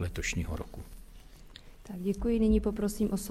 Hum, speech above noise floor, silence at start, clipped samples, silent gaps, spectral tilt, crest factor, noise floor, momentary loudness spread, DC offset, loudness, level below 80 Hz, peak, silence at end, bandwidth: none; 20 dB; 0 s; under 0.1%; none; -6 dB/octave; 16 dB; -51 dBFS; 25 LU; under 0.1%; -31 LUFS; -40 dBFS; -16 dBFS; 0 s; 15.5 kHz